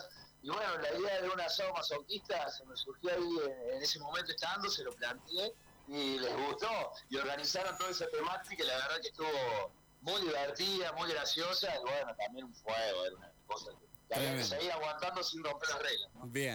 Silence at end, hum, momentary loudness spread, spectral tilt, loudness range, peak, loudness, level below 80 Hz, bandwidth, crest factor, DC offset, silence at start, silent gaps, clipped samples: 0 s; none; 8 LU; -2.5 dB/octave; 2 LU; -28 dBFS; -37 LUFS; -70 dBFS; over 20 kHz; 10 dB; under 0.1%; 0 s; none; under 0.1%